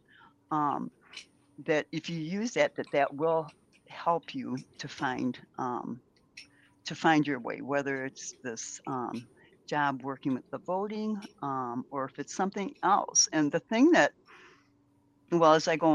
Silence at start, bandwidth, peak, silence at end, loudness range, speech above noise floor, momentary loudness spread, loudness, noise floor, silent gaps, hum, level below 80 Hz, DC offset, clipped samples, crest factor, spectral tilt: 0.5 s; 11 kHz; -8 dBFS; 0 s; 7 LU; 37 dB; 16 LU; -30 LUFS; -67 dBFS; none; none; -76 dBFS; under 0.1%; under 0.1%; 22 dB; -3.5 dB/octave